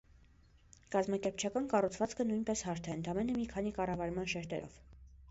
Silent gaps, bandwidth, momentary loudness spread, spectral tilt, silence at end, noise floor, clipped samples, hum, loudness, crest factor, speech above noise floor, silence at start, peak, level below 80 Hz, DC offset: none; 8 kHz; 6 LU; -5.5 dB/octave; 0 s; -64 dBFS; under 0.1%; none; -37 LUFS; 20 dB; 28 dB; 0.9 s; -18 dBFS; -58 dBFS; under 0.1%